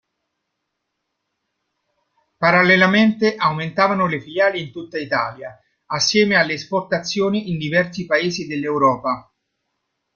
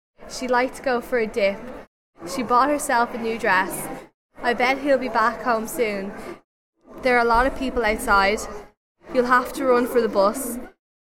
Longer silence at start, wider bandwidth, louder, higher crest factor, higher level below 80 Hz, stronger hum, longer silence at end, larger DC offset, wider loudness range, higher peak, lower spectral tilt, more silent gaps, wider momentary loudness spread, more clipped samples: first, 2.4 s vs 0.2 s; second, 7.2 kHz vs 16.5 kHz; first, -18 LUFS vs -21 LUFS; about the same, 18 dB vs 18 dB; second, -60 dBFS vs -44 dBFS; neither; first, 0.95 s vs 0.45 s; neither; about the same, 3 LU vs 2 LU; about the same, -2 dBFS vs -4 dBFS; about the same, -4.5 dB/octave vs -3.5 dB/octave; second, none vs 1.87-2.13 s, 4.14-4.29 s, 6.44-6.73 s, 8.77-8.95 s; about the same, 14 LU vs 16 LU; neither